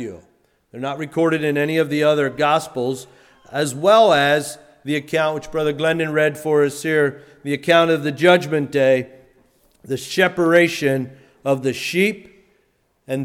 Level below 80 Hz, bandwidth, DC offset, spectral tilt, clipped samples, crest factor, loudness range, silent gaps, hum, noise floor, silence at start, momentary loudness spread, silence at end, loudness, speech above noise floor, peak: -58 dBFS; 16.5 kHz; under 0.1%; -5 dB/octave; under 0.1%; 18 dB; 3 LU; none; none; -64 dBFS; 0 s; 14 LU; 0 s; -18 LUFS; 46 dB; -2 dBFS